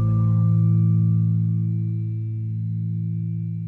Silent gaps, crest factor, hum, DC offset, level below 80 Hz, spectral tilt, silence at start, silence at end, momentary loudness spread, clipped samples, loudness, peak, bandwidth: none; 10 dB; none; under 0.1%; -52 dBFS; -13 dB/octave; 0 s; 0 s; 9 LU; under 0.1%; -22 LUFS; -12 dBFS; 1.3 kHz